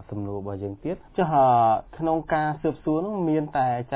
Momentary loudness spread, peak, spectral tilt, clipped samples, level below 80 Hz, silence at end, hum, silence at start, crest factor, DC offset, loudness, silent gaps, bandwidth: 13 LU; -10 dBFS; -11.5 dB/octave; under 0.1%; -52 dBFS; 0 s; none; 0 s; 14 dB; under 0.1%; -24 LUFS; none; 4 kHz